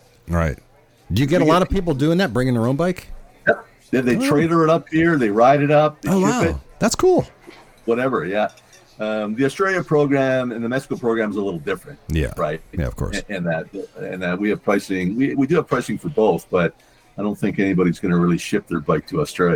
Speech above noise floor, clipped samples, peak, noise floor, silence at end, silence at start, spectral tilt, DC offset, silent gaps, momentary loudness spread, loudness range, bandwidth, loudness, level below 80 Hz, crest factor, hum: 26 dB; under 0.1%; -2 dBFS; -45 dBFS; 0 s; 0.25 s; -6.5 dB/octave; under 0.1%; none; 10 LU; 6 LU; 18.5 kHz; -20 LUFS; -38 dBFS; 18 dB; none